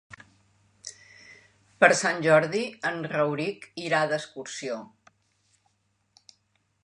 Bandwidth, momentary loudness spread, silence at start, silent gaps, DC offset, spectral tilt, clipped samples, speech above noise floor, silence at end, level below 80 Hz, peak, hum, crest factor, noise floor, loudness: 11 kHz; 19 LU; 0.1 s; none; under 0.1%; -4 dB/octave; under 0.1%; 46 dB; 2 s; -74 dBFS; -4 dBFS; none; 26 dB; -71 dBFS; -25 LUFS